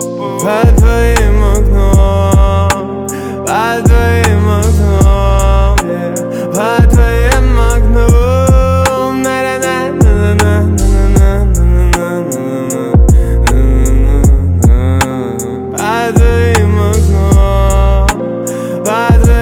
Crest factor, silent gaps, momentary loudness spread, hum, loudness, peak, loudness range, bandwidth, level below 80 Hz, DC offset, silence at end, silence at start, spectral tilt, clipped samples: 8 dB; none; 8 LU; none; -10 LUFS; 0 dBFS; 1 LU; 16 kHz; -12 dBFS; under 0.1%; 0 s; 0 s; -6 dB/octave; under 0.1%